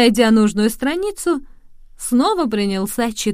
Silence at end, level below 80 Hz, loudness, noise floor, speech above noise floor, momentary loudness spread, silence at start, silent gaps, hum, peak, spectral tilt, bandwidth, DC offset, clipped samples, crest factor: 0 s; -42 dBFS; -18 LUFS; -40 dBFS; 24 dB; 8 LU; 0 s; none; none; 0 dBFS; -4.5 dB/octave; 16 kHz; under 0.1%; under 0.1%; 16 dB